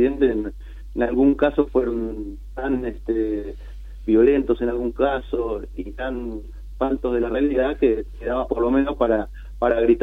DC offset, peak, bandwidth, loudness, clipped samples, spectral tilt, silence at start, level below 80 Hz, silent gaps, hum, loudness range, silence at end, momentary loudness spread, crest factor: under 0.1%; -4 dBFS; 4.6 kHz; -22 LUFS; under 0.1%; -8.5 dB/octave; 0 s; -36 dBFS; none; none; 2 LU; 0 s; 16 LU; 16 dB